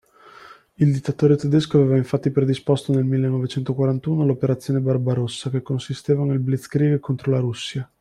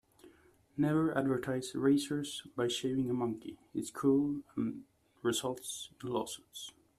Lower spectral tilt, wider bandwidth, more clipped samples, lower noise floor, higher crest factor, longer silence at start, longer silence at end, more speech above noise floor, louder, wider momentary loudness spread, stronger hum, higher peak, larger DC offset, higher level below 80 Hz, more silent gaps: first, -8 dB/octave vs -5 dB/octave; second, 11.5 kHz vs 14.5 kHz; neither; second, -46 dBFS vs -63 dBFS; about the same, 16 dB vs 18 dB; first, 0.5 s vs 0.25 s; second, 0.15 s vs 0.3 s; about the same, 26 dB vs 29 dB; first, -21 LUFS vs -35 LUFS; second, 7 LU vs 12 LU; neither; first, -4 dBFS vs -16 dBFS; neither; first, -58 dBFS vs -70 dBFS; neither